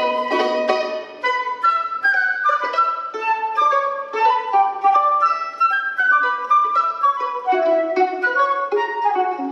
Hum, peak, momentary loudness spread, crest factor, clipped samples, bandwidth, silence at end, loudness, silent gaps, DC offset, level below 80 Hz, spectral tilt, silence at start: none; -4 dBFS; 5 LU; 16 dB; under 0.1%; 8.2 kHz; 0 s; -18 LUFS; none; under 0.1%; -84 dBFS; -2.5 dB/octave; 0 s